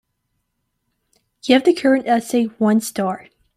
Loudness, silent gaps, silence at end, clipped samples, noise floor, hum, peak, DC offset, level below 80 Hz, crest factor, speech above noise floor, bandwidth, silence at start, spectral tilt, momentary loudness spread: -17 LUFS; none; 0.4 s; under 0.1%; -73 dBFS; none; -2 dBFS; under 0.1%; -64 dBFS; 18 dB; 56 dB; 15.5 kHz; 1.45 s; -5 dB/octave; 10 LU